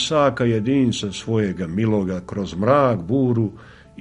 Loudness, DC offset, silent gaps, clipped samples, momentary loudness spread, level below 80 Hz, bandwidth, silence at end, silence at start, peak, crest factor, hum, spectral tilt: -20 LUFS; under 0.1%; none; under 0.1%; 9 LU; -48 dBFS; 10.5 kHz; 0 s; 0 s; -2 dBFS; 18 dB; none; -6.5 dB/octave